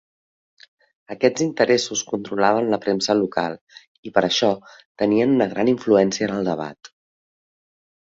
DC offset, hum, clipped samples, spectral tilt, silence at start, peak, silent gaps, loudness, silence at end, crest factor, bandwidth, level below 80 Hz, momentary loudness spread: under 0.1%; none; under 0.1%; -4.5 dB/octave; 1.1 s; -2 dBFS; 3.61-3.67 s, 3.87-4.03 s, 4.85-4.95 s; -20 LUFS; 1.2 s; 20 dB; 7.8 kHz; -62 dBFS; 11 LU